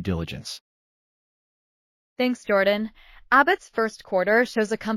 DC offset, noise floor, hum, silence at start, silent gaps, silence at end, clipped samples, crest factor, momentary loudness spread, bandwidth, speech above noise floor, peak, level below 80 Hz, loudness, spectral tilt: under 0.1%; under -90 dBFS; none; 0 s; 0.61-2.16 s; 0 s; under 0.1%; 20 dB; 16 LU; 16 kHz; over 67 dB; -4 dBFS; -52 dBFS; -23 LUFS; -5 dB/octave